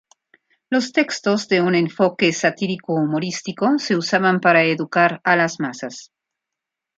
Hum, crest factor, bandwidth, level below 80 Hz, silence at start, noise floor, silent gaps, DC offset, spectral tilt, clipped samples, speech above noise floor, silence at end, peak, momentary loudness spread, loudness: none; 18 dB; 9 kHz; -66 dBFS; 0.7 s; -84 dBFS; none; under 0.1%; -5 dB/octave; under 0.1%; 65 dB; 0.95 s; -2 dBFS; 10 LU; -19 LUFS